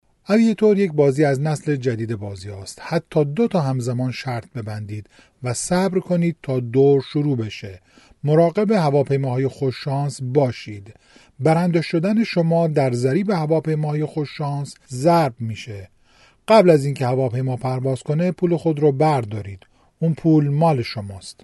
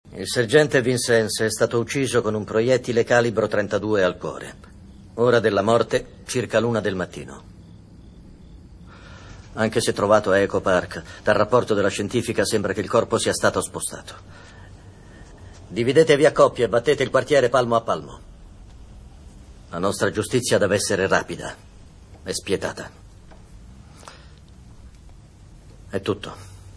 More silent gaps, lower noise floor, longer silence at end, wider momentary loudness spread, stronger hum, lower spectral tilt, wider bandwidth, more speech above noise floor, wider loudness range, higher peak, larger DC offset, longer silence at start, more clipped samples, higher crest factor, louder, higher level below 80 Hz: neither; first, -54 dBFS vs -46 dBFS; about the same, 0.1 s vs 0.05 s; second, 15 LU vs 18 LU; neither; first, -7 dB/octave vs -4.5 dB/octave; about the same, 11.5 kHz vs 11 kHz; first, 35 dB vs 25 dB; second, 4 LU vs 11 LU; about the same, -2 dBFS vs -2 dBFS; neither; first, 0.3 s vs 0.05 s; neither; about the same, 18 dB vs 20 dB; about the same, -20 LUFS vs -21 LUFS; second, -58 dBFS vs -48 dBFS